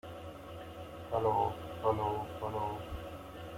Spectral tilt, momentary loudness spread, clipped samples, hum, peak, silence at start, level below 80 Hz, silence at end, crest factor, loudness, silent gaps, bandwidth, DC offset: -7 dB/octave; 15 LU; under 0.1%; none; -18 dBFS; 0.05 s; -56 dBFS; 0 s; 18 dB; -36 LUFS; none; 16.5 kHz; under 0.1%